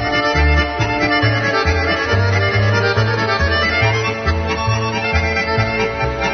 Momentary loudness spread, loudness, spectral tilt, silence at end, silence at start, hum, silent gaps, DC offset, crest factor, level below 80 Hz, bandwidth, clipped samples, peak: 4 LU; -16 LUFS; -5.5 dB/octave; 0 s; 0 s; none; none; under 0.1%; 14 dB; -28 dBFS; 6.6 kHz; under 0.1%; -2 dBFS